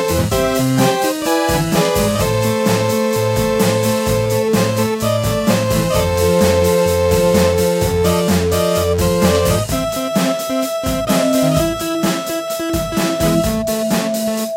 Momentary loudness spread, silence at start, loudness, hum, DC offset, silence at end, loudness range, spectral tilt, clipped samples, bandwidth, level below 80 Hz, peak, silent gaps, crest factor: 5 LU; 0 s; -16 LUFS; none; under 0.1%; 0 s; 3 LU; -5 dB/octave; under 0.1%; 17 kHz; -32 dBFS; 0 dBFS; none; 14 dB